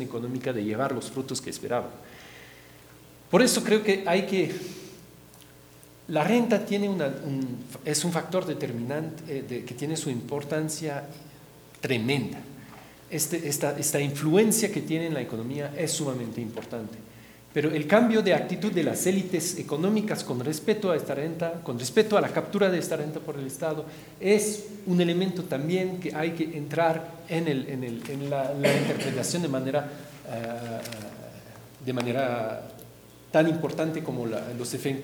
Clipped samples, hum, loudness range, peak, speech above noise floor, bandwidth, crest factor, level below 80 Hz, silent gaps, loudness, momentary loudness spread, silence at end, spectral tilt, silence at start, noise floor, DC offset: under 0.1%; none; 5 LU; -4 dBFS; 24 dB; over 20 kHz; 22 dB; -66 dBFS; none; -27 LUFS; 15 LU; 0 s; -5 dB/octave; 0 s; -51 dBFS; under 0.1%